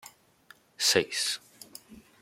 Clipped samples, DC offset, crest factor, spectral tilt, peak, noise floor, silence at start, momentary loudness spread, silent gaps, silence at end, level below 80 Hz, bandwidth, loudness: under 0.1%; under 0.1%; 24 dB; -1 dB/octave; -8 dBFS; -59 dBFS; 0.05 s; 23 LU; none; 0.2 s; -72 dBFS; 16.5 kHz; -27 LUFS